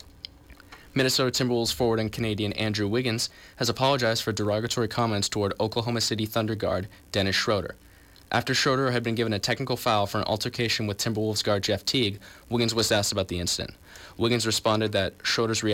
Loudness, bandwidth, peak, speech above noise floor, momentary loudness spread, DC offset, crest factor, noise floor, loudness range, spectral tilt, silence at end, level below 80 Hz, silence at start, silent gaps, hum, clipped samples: -26 LUFS; 17 kHz; -12 dBFS; 23 dB; 6 LU; under 0.1%; 14 dB; -49 dBFS; 1 LU; -4 dB/octave; 0 s; -54 dBFS; 0.05 s; none; none; under 0.1%